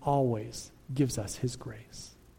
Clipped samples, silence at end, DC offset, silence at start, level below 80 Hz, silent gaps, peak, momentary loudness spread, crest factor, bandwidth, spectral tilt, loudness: under 0.1%; 0.25 s; under 0.1%; 0 s; -54 dBFS; none; -16 dBFS; 17 LU; 18 dB; 16.5 kHz; -6 dB/octave; -33 LUFS